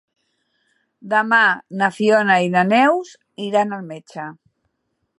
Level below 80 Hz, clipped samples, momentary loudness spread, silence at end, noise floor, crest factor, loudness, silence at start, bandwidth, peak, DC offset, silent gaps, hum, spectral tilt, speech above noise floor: -74 dBFS; under 0.1%; 18 LU; 0.85 s; -73 dBFS; 18 dB; -17 LUFS; 1.05 s; 11.5 kHz; -2 dBFS; under 0.1%; none; none; -5.5 dB/octave; 55 dB